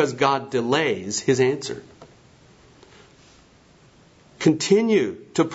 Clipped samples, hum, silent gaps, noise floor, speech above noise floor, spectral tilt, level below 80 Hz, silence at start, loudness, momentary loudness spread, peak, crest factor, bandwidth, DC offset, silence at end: under 0.1%; none; none; -53 dBFS; 32 dB; -4.5 dB/octave; -62 dBFS; 0 s; -21 LUFS; 9 LU; -4 dBFS; 20 dB; 8 kHz; under 0.1%; 0 s